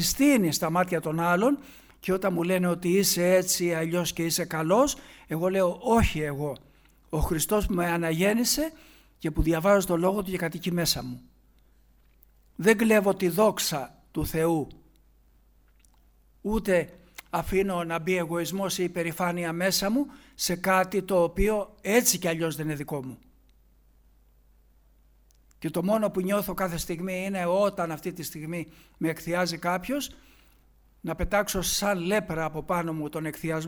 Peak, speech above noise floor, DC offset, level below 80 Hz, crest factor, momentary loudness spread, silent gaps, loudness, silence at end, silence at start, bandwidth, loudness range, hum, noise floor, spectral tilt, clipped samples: -8 dBFS; 34 dB; under 0.1%; -44 dBFS; 20 dB; 12 LU; none; -26 LUFS; 0 s; 0 s; over 20 kHz; 6 LU; none; -60 dBFS; -4.5 dB/octave; under 0.1%